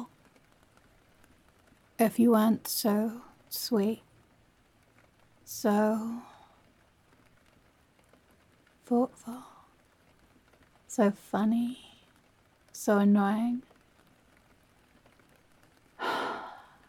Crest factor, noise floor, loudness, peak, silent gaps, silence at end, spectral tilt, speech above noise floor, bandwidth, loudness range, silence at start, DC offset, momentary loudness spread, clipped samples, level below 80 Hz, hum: 18 dB; -65 dBFS; -29 LUFS; -14 dBFS; none; 0.3 s; -5.5 dB/octave; 38 dB; 17.5 kHz; 9 LU; 0 s; under 0.1%; 20 LU; under 0.1%; -72 dBFS; none